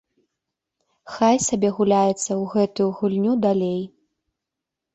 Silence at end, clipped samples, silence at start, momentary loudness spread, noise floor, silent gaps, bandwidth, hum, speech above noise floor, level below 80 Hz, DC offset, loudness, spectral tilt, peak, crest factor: 1.05 s; under 0.1%; 1.05 s; 8 LU; -85 dBFS; none; 8.4 kHz; none; 64 dB; -60 dBFS; under 0.1%; -21 LUFS; -5.5 dB/octave; -6 dBFS; 18 dB